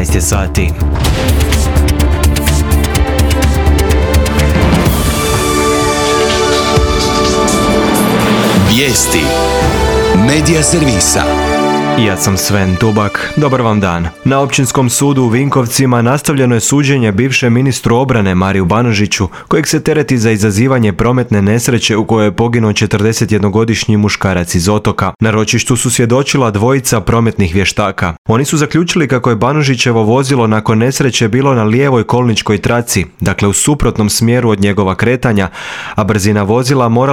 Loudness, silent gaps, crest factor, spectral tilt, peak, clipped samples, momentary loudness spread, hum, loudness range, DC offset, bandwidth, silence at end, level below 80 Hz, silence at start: -11 LUFS; 28.18-28.25 s; 10 dB; -5 dB/octave; 0 dBFS; under 0.1%; 3 LU; none; 2 LU; under 0.1%; over 20 kHz; 0 s; -22 dBFS; 0 s